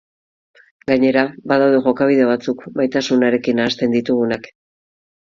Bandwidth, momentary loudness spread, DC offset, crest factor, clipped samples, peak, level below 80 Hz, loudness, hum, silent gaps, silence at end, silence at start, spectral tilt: 7.4 kHz; 7 LU; under 0.1%; 18 dB; under 0.1%; 0 dBFS; -58 dBFS; -17 LUFS; none; none; 0.75 s; 0.9 s; -6 dB/octave